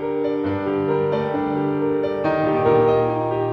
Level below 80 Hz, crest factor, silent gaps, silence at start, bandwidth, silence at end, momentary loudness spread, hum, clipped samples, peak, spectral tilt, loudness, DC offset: -52 dBFS; 14 dB; none; 0 s; 5.8 kHz; 0 s; 6 LU; none; under 0.1%; -6 dBFS; -9.5 dB/octave; -20 LUFS; under 0.1%